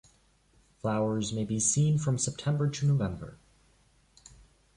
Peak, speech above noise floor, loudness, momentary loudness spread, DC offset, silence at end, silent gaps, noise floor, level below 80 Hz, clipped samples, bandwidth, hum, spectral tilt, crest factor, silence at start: -14 dBFS; 37 dB; -29 LUFS; 10 LU; under 0.1%; 1.4 s; none; -65 dBFS; -56 dBFS; under 0.1%; 11.5 kHz; none; -5.5 dB/octave; 16 dB; 0.85 s